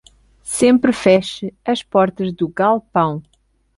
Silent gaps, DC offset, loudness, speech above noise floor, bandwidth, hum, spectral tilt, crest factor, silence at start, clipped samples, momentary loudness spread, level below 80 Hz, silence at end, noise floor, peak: none; under 0.1%; -17 LUFS; 20 dB; 11.5 kHz; none; -5 dB/octave; 18 dB; 0.45 s; under 0.1%; 12 LU; -52 dBFS; 0.55 s; -36 dBFS; 0 dBFS